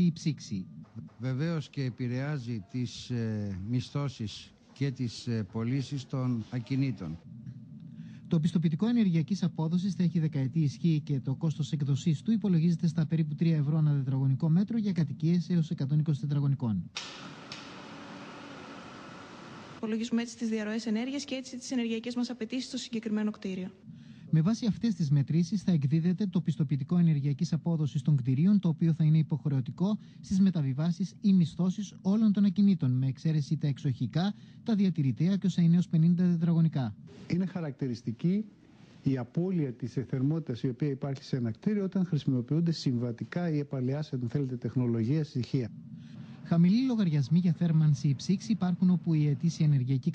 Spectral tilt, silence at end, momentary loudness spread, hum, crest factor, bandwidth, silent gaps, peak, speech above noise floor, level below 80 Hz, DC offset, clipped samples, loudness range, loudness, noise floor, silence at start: -8 dB/octave; 0 s; 14 LU; none; 14 dB; 8.6 kHz; none; -16 dBFS; 20 dB; -66 dBFS; under 0.1%; under 0.1%; 7 LU; -30 LUFS; -48 dBFS; 0 s